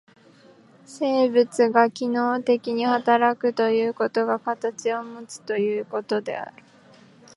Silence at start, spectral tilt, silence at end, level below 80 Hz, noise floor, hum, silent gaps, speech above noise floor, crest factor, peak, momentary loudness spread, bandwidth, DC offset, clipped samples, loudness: 0.9 s; -4.5 dB/octave; 0.85 s; -80 dBFS; -53 dBFS; none; none; 30 dB; 20 dB; -2 dBFS; 10 LU; 11.5 kHz; under 0.1%; under 0.1%; -23 LUFS